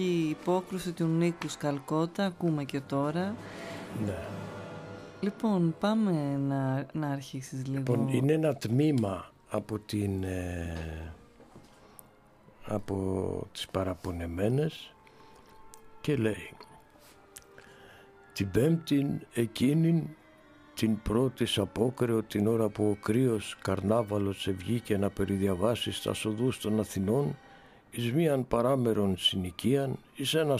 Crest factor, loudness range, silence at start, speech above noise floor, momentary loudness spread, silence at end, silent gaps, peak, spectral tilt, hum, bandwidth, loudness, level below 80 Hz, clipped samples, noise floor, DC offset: 18 dB; 8 LU; 0 s; 29 dB; 13 LU; 0 s; none; -12 dBFS; -6.5 dB/octave; none; 15.5 kHz; -31 LUFS; -56 dBFS; under 0.1%; -58 dBFS; under 0.1%